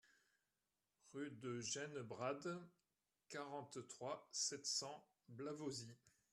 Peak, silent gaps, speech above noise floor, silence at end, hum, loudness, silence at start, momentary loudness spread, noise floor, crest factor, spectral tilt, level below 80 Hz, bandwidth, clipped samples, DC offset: -30 dBFS; none; over 41 dB; 0.25 s; none; -48 LUFS; 0.05 s; 12 LU; under -90 dBFS; 20 dB; -3 dB/octave; -90 dBFS; 13 kHz; under 0.1%; under 0.1%